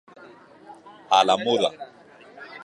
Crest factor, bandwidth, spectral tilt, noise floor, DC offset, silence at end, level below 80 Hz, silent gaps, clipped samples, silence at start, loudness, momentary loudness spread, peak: 22 dB; 10.5 kHz; -3 dB/octave; -49 dBFS; under 0.1%; 0.05 s; -72 dBFS; none; under 0.1%; 0.7 s; -21 LUFS; 24 LU; -4 dBFS